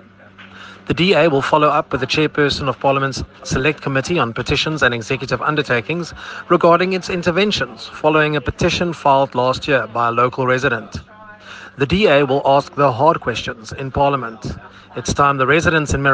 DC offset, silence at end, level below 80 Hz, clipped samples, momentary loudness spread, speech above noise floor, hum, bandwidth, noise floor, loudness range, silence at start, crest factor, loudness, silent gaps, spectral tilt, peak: under 0.1%; 0 s; -40 dBFS; under 0.1%; 14 LU; 25 dB; none; 9.8 kHz; -42 dBFS; 2 LU; 0.4 s; 16 dB; -16 LUFS; none; -5 dB/octave; 0 dBFS